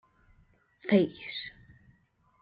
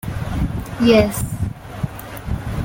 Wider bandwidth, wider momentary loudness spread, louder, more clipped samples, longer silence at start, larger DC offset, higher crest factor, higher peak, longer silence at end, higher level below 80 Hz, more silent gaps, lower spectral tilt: second, 5.2 kHz vs 17 kHz; about the same, 16 LU vs 14 LU; second, -30 LUFS vs -20 LUFS; neither; first, 0.85 s vs 0.05 s; neither; about the same, 22 dB vs 18 dB; second, -10 dBFS vs -2 dBFS; first, 0.9 s vs 0 s; second, -68 dBFS vs -32 dBFS; neither; first, -9 dB/octave vs -6 dB/octave